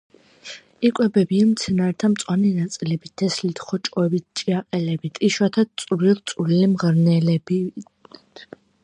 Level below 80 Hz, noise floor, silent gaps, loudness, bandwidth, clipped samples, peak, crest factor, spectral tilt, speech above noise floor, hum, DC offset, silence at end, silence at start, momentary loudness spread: -60 dBFS; -41 dBFS; none; -21 LUFS; 10.5 kHz; under 0.1%; -4 dBFS; 16 dB; -6.5 dB/octave; 21 dB; none; under 0.1%; 0.4 s; 0.45 s; 9 LU